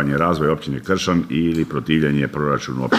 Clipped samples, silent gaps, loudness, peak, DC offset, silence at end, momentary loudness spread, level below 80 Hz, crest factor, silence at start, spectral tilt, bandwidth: under 0.1%; none; -20 LUFS; -2 dBFS; under 0.1%; 0 s; 4 LU; -44 dBFS; 16 dB; 0 s; -6 dB/octave; 15 kHz